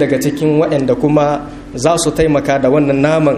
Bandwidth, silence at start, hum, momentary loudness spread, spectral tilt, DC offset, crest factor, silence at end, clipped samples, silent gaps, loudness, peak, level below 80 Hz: 15 kHz; 0 s; none; 5 LU; -6 dB/octave; under 0.1%; 12 dB; 0 s; under 0.1%; none; -13 LUFS; 0 dBFS; -36 dBFS